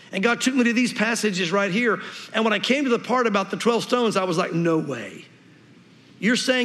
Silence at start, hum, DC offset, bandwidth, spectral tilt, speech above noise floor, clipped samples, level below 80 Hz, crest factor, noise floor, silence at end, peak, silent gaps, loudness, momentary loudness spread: 0.1 s; none; under 0.1%; 14 kHz; -4 dB/octave; 29 dB; under 0.1%; -80 dBFS; 16 dB; -51 dBFS; 0 s; -6 dBFS; none; -22 LUFS; 6 LU